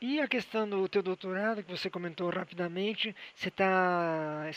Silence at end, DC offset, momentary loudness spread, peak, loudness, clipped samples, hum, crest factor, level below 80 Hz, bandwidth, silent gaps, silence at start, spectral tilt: 0 s; under 0.1%; 9 LU; -14 dBFS; -32 LUFS; under 0.1%; none; 18 dB; -78 dBFS; 9.4 kHz; none; 0 s; -6 dB/octave